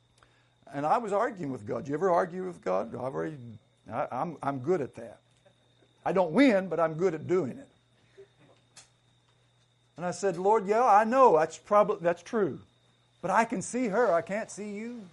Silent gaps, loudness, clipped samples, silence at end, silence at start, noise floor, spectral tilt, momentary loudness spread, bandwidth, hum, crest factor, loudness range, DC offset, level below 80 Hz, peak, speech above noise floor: none; -28 LUFS; under 0.1%; 0.05 s; 0.7 s; -67 dBFS; -6 dB/octave; 16 LU; 11.5 kHz; none; 20 dB; 9 LU; under 0.1%; -72 dBFS; -10 dBFS; 39 dB